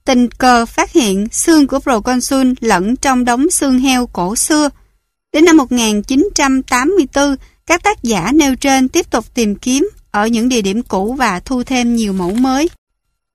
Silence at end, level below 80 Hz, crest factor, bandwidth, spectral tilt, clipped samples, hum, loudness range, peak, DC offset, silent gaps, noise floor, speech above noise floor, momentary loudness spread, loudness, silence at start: 0.65 s; -38 dBFS; 14 dB; 15 kHz; -3.5 dB/octave; under 0.1%; none; 3 LU; 0 dBFS; under 0.1%; none; -58 dBFS; 45 dB; 6 LU; -13 LUFS; 0.05 s